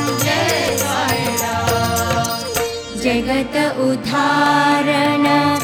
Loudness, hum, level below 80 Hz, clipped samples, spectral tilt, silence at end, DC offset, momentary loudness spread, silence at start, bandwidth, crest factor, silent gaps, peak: -17 LUFS; none; -42 dBFS; under 0.1%; -4 dB/octave; 0 s; under 0.1%; 5 LU; 0 s; over 20 kHz; 14 dB; none; -2 dBFS